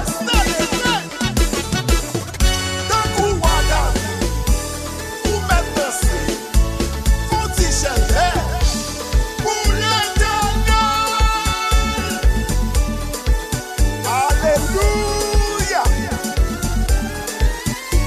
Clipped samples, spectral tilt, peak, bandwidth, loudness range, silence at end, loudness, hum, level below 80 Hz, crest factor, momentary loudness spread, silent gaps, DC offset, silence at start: under 0.1%; -4 dB/octave; -2 dBFS; 14 kHz; 2 LU; 0 s; -19 LUFS; none; -20 dBFS; 16 dB; 5 LU; none; under 0.1%; 0 s